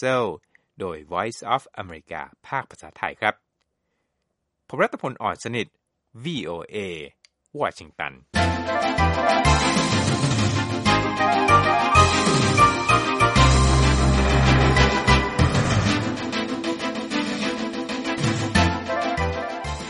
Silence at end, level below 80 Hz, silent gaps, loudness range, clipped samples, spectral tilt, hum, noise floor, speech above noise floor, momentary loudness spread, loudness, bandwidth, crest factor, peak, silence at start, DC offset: 0 s; -30 dBFS; none; 12 LU; under 0.1%; -5 dB/octave; none; -77 dBFS; 51 dB; 15 LU; -21 LUFS; 11.5 kHz; 20 dB; -2 dBFS; 0 s; under 0.1%